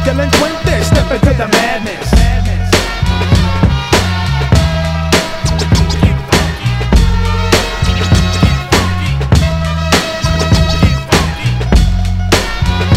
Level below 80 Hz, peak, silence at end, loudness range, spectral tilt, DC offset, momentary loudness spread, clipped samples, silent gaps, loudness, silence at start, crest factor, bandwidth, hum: -16 dBFS; 0 dBFS; 0 s; 0 LU; -5 dB/octave; under 0.1%; 4 LU; 0.4%; none; -12 LUFS; 0 s; 10 dB; 16 kHz; none